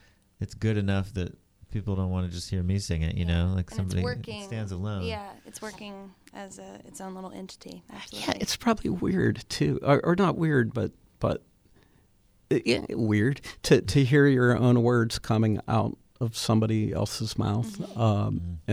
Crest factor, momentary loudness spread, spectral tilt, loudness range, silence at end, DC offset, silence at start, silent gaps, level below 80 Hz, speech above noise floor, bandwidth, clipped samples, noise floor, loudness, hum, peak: 20 dB; 19 LU; -6 dB/octave; 12 LU; 0 s; under 0.1%; 0.4 s; none; -46 dBFS; 36 dB; 15 kHz; under 0.1%; -62 dBFS; -27 LUFS; none; -6 dBFS